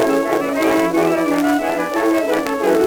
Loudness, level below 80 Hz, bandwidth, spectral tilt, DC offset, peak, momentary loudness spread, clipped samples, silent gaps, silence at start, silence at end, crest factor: -17 LUFS; -50 dBFS; over 20 kHz; -4.5 dB/octave; under 0.1%; -2 dBFS; 3 LU; under 0.1%; none; 0 s; 0 s; 14 dB